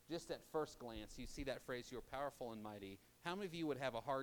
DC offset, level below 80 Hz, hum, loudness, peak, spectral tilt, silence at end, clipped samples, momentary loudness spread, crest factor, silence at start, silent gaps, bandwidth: under 0.1%; -64 dBFS; none; -48 LUFS; -28 dBFS; -5 dB/octave; 0 s; under 0.1%; 9 LU; 20 dB; 0 s; none; 19.5 kHz